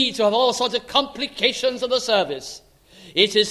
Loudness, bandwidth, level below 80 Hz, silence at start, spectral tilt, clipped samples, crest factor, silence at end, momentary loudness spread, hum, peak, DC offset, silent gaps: -20 LUFS; 13.5 kHz; -58 dBFS; 0 s; -2.5 dB/octave; under 0.1%; 20 dB; 0 s; 10 LU; none; -2 dBFS; under 0.1%; none